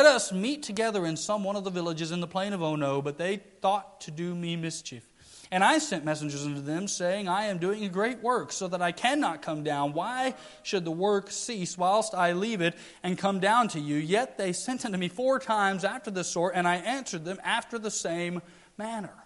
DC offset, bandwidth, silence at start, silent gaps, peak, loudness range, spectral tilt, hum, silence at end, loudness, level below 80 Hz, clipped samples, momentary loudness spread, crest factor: under 0.1%; 11.5 kHz; 0 s; none; -6 dBFS; 3 LU; -4 dB/octave; none; 0 s; -29 LUFS; -70 dBFS; under 0.1%; 8 LU; 24 dB